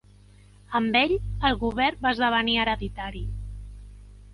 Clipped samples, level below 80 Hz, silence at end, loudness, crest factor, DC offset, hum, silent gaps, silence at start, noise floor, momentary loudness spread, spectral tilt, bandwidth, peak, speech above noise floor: under 0.1%; -38 dBFS; 0 s; -25 LUFS; 20 dB; under 0.1%; 50 Hz at -40 dBFS; none; 0.7 s; -52 dBFS; 16 LU; -6 dB/octave; 11.5 kHz; -6 dBFS; 28 dB